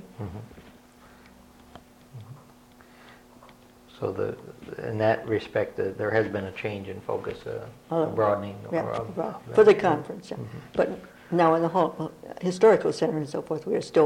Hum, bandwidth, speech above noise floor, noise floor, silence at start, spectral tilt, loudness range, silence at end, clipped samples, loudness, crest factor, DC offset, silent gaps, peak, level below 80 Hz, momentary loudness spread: none; 13 kHz; 27 dB; -53 dBFS; 0 s; -6.5 dB/octave; 14 LU; 0 s; under 0.1%; -26 LUFS; 20 dB; under 0.1%; none; -6 dBFS; -60 dBFS; 19 LU